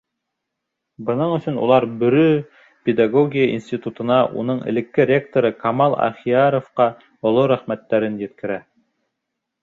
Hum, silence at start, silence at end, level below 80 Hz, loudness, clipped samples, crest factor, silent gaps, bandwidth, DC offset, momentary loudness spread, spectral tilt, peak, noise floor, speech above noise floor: none; 1 s; 1.05 s; -62 dBFS; -19 LUFS; under 0.1%; 16 dB; none; 7.4 kHz; under 0.1%; 9 LU; -8.5 dB/octave; -2 dBFS; -79 dBFS; 61 dB